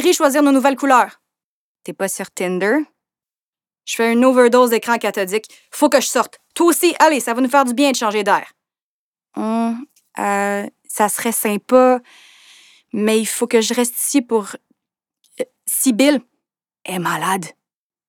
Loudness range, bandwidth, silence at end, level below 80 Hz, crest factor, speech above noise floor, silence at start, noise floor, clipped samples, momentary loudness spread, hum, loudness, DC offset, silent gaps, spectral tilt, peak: 5 LU; 19.5 kHz; 0.6 s; -72 dBFS; 18 dB; over 74 dB; 0 s; under -90 dBFS; under 0.1%; 14 LU; none; -17 LUFS; under 0.1%; 1.44-1.75 s, 3.39-3.53 s, 8.82-9.13 s; -3 dB/octave; 0 dBFS